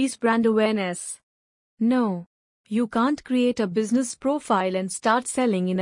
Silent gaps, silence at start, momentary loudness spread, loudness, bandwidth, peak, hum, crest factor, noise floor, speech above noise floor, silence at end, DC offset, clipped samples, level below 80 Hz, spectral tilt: 1.23-1.77 s, 2.26-2.64 s; 0 s; 8 LU; -23 LUFS; 11 kHz; -8 dBFS; none; 16 dB; under -90 dBFS; over 67 dB; 0 s; under 0.1%; under 0.1%; -66 dBFS; -5 dB/octave